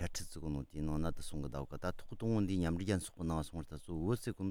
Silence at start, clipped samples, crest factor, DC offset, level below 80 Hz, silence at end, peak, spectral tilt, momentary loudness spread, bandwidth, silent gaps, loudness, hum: 0 s; under 0.1%; 16 dB; under 0.1%; -52 dBFS; 0 s; -22 dBFS; -6.5 dB/octave; 8 LU; 17 kHz; none; -40 LUFS; none